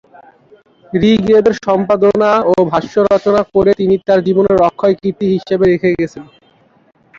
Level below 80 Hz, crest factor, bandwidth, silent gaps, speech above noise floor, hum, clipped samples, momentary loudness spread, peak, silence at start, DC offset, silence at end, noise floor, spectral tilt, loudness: -44 dBFS; 12 dB; 7.4 kHz; none; 31 dB; none; under 0.1%; 5 LU; 0 dBFS; 0.95 s; under 0.1%; 0.95 s; -43 dBFS; -7.5 dB/octave; -12 LUFS